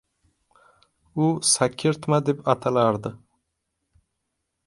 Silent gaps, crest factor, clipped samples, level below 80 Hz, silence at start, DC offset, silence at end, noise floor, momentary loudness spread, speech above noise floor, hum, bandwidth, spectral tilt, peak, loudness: none; 22 dB; under 0.1%; -62 dBFS; 1.15 s; under 0.1%; 1.5 s; -79 dBFS; 9 LU; 56 dB; none; 11.5 kHz; -4.5 dB/octave; -2 dBFS; -22 LUFS